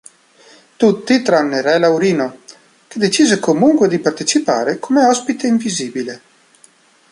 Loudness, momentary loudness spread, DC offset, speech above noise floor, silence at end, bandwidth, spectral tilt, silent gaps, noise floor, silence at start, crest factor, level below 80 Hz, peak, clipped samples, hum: -15 LUFS; 10 LU; under 0.1%; 36 dB; 0.95 s; 11.5 kHz; -4 dB/octave; none; -50 dBFS; 0.8 s; 16 dB; -62 dBFS; 0 dBFS; under 0.1%; none